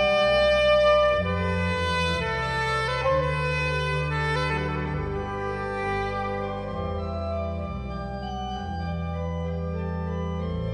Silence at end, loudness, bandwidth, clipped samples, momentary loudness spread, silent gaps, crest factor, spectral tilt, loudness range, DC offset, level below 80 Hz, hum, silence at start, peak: 0 s; -26 LUFS; 10 kHz; under 0.1%; 11 LU; none; 14 dB; -6 dB/octave; 8 LU; under 0.1%; -38 dBFS; none; 0 s; -10 dBFS